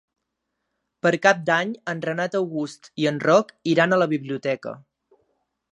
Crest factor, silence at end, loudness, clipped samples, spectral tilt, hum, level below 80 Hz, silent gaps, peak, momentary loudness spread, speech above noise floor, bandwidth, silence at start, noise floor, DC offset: 22 dB; 0.95 s; -22 LUFS; under 0.1%; -5.5 dB/octave; none; -74 dBFS; none; -2 dBFS; 12 LU; 57 dB; 11 kHz; 1.05 s; -79 dBFS; under 0.1%